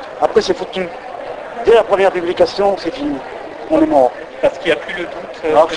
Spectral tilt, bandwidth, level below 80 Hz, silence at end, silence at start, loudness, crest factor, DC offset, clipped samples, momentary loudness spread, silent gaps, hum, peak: -5 dB/octave; 10.5 kHz; -46 dBFS; 0 s; 0 s; -16 LUFS; 16 dB; under 0.1%; under 0.1%; 15 LU; none; none; 0 dBFS